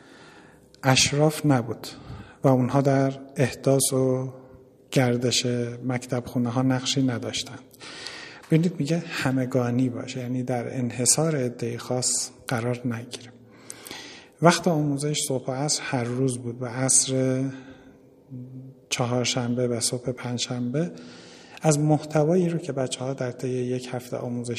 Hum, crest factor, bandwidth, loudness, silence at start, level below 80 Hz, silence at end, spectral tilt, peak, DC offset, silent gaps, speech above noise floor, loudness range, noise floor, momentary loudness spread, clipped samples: none; 24 dB; 15 kHz; -24 LUFS; 0.15 s; -60 dBFS; 0 s; -4.5 dB/octave; 0 dBFS; under 0.1%; none; 27 dB; 4 LU; -52 dBFS; 18 LU; under 0.1%